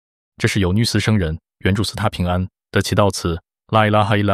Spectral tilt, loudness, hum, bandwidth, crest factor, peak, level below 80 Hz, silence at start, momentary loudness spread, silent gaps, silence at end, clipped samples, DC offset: -5.5 dB/octave; -19 LUFS; none; 14.5 kHz; 16 dB; -2 dBFS; -38 dBFS; 0.4 s; 8 LU; none; 0 s; under 0.1%; under 0.1%